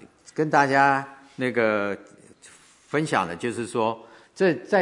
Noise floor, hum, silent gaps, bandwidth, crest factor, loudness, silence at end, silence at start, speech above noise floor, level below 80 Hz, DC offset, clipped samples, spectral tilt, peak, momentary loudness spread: -52 dBFS; none; none; 11 kHz; 22 dB; -24 LUFS; 0 s; 0.35 s; 29 dB; -72 dBFS; under 0.1%; under 0.1%; -5.5 dB/octave; -4 dBFS; 13 LU